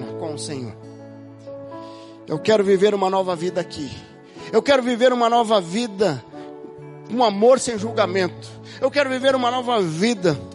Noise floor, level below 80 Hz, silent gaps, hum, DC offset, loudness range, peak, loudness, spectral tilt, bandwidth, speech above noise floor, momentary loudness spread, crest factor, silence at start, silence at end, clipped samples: -40 dBFS; -60 dBFS; none; none; under 0.1%; 3 LU; -4 dBFS; -20 LUFS; -4.5 dB/octave; 11.5 kHz; 20 dB; 22 LU; 18 dB; 0 s; 0 s; under 0.1%